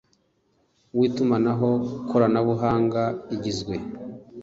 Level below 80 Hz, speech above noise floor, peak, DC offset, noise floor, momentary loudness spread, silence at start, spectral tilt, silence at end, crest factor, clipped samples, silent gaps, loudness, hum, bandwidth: -54 dBFS; 44 dB; -6 dBFS; under 0.1%; -67 dBFS; 11 LU; 0.95 s; -7.5 dB/octave; 0 s; 18 dB; under 0.1%; none; -24 LUFS; none; 7.8 kHz